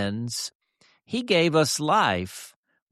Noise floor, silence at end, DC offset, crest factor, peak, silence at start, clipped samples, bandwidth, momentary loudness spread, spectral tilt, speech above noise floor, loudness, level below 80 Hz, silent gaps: -64 dBFS; 0.45 s; under 0.1%; 18 dB; -8 dBFS; 0 s; under 0.1%; 14 kHz; 15 LU; -4 dB/octave; 39 dB; -24 LUFS; -62 dBFS; 0.55-0.60 s